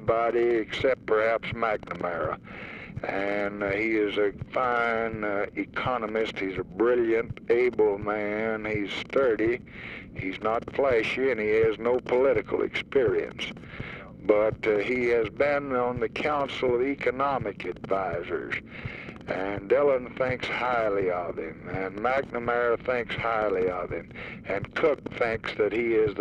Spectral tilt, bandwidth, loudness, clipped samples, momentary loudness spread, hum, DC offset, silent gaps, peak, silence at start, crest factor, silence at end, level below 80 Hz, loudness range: -6.5 dB/octave; 8.8 kHz; -27 LUFS; under 0.1%; 11 LU; none; under 0.1%; none; -8 dBFS; 0 s; 18 dB; 0 s; -52 dBFS; 3 LU